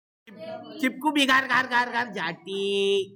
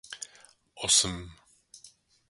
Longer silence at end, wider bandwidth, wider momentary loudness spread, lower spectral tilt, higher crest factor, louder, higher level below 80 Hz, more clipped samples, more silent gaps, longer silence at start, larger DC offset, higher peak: second, 0 s vs 0.45 s; first, 17.5 kHz vs 12 kHz; about the same, 19 LU vs 21 LU; first, -3 dB/octave vs -0.5 dB/octave; second, 18 dB vs 26 dB; about the same, -24 LUFS vs -24 LUFS; second, -74 dBFS vs -56 dBFS; neither; neither; first, 0.25 s vs 0.1 s; neither; about the same, -8 dBFS vs -8 dBFS